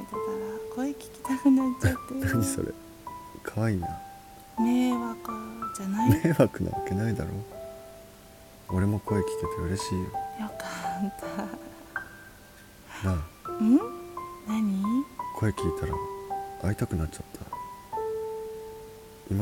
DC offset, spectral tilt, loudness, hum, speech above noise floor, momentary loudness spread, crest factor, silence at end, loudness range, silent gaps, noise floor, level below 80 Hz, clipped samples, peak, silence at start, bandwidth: under 0.1%; -6.5 dB/octave; -30 LUFS; none; 23 dB; 20 LU; 22 dB; 0 s; 7 LU; none; -51 dBFS; -48 dBFS; under 0.1%; -8 dBFS; 0 s; 17.5 kHz